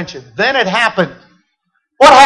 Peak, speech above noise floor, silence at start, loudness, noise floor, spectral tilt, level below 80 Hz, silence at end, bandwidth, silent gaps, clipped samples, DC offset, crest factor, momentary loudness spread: 0 dBFS; 51 dB; 0 s; -12 LUFS; -66 dBFS; -3 dB/octave; -48 dBFS; 0 s; 13.5 kHz; none; 0.8%; under 0.1%; 12 dB; 12 LU